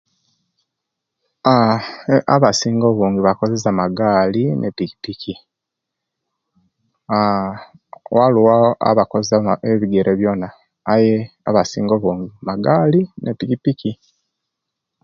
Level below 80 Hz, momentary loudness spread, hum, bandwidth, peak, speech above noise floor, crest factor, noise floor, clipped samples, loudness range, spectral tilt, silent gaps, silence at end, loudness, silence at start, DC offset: -52 dBFS; 12 LU; none; 7.6 kHz; 0 dBFS; 65 dB; 18 dB; -81 dBFS; under 0.1%; 6 LU; -6.5 dB/octave; none; 1.1 s; -17 LUFS; 1.45 s; under 0.1%